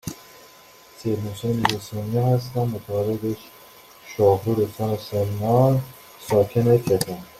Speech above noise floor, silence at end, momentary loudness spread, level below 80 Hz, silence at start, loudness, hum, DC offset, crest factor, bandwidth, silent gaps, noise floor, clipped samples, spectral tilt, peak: 27 dB; 0.1 s; 13 LU; -54 dBFS; 0.05 s; -22 LUFS; none; under 0.1%; 20 dB; 16 kHz; none; -49 dBFS; under 0.1%; -6.5 dB/octave; -2 dBFS